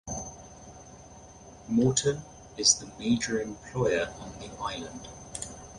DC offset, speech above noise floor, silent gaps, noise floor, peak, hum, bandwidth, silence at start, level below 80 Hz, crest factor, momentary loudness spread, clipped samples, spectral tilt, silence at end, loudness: under 0.1%; 21 dB; none; -50 dBFS; -6 dBFS; none; 11.5 kHz; 0.05 s; -54 dBFS; 24 dB; 25 LU; under 0.1%; -3.5 dB/octave; 0 s; -28 LUFS